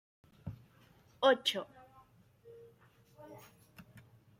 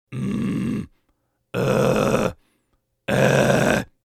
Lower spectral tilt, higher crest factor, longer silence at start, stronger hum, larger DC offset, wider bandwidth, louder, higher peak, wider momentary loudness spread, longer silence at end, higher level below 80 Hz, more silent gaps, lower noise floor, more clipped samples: second, -3.5 dB/octave vs -6 dB/octave; first, 26 dB vs 20 dB; first, 0.45 s vs 0.1 s; neither; neither; about the same, 16 kHz vs 15.5 kHz; second, -32 LUFS vs -21 LUFS; second, -14 dBFS vs -2 dBFS; first, 29 LU vs 13 LU; about the same, 0.4 s vs 0.3 s; second, -72 dBFS vs -46 dBFS; neither; second, -65 dBFS vs -70 dBFS; neither